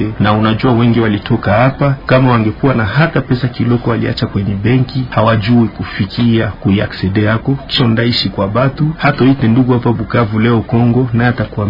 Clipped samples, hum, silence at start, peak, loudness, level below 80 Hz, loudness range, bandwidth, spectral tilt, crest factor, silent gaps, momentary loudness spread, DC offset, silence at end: under 0.1%; none; 0 s; 0 dBFS; -12 LUFS; -34 dBFS; 2 LU; 5.4 kHz; -9 dB/octave; 12 dB; none; 5 LU; under 0.1%; 0 s